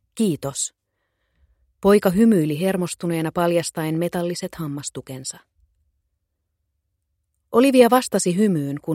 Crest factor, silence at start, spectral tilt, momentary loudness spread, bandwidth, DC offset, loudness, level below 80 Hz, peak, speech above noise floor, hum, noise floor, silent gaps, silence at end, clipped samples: 20 dB; 0.15 s; -5.5 dB/octave; 14 LU; 16.5 kHz; under 0.1%; -20 LUFS; -56 dBFS; -2 dBFS; 56 dB; none; -76 dBFS; none; 0 s; under 0.1%